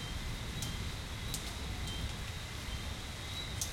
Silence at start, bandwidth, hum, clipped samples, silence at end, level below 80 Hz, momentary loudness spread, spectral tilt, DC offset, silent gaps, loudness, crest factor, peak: 0 s; 16.5 kHz; none; under 0.1%; 0 s; -44 dBFS; 3 LU; -3 dB/octave; under 0.1%; none; -40 LUFS; 20 dB; -20 dBFS